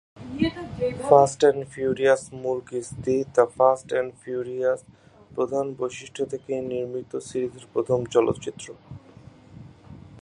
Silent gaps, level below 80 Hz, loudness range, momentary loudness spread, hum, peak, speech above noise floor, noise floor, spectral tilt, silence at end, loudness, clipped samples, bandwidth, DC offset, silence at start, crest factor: none; -56 dBFS; 7 LU; 13 LU; none; -2 dBFS; 25 dB; -49 dBFS; -5.5 dB/octave; 0 s; -24 LUFS; under 0.1%; 11 kHz; under 0.1%; 0.15 s; 24 dB